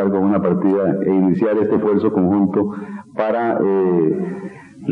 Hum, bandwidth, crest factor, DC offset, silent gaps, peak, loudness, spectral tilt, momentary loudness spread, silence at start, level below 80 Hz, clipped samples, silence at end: none; 4.6 kHz; 14 dB; under 0.1%; none; -4 dBFS; -17 LUFS; -10.5 dB/octave; 12 LU; 0 s; -62 dBFS; under 0.1%; 0 s